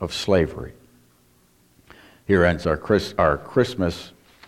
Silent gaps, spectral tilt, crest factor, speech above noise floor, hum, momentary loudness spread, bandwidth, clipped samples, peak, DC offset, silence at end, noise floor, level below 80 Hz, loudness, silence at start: none; -6 dB/octave; 20 dB; 37 dB; 60 Hz at -50 dBFS; 19 LU; 15.5 kHz; under 0.1%; -4 dBFS; under 0.1%; 0.4 s; -59 dBFS; -42 dBFS; -21 LUFS; 0 s